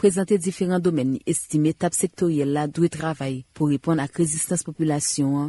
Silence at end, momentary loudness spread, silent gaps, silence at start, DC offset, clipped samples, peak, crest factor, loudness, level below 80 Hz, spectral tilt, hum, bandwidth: 0 s; 3 LU; none; 0 s; under 0.1%; under 0.1%; -8 dBFS; 16 dB; -23 LUFS; -58 dBFS; -5.5 dB/octave; none; 12 kHz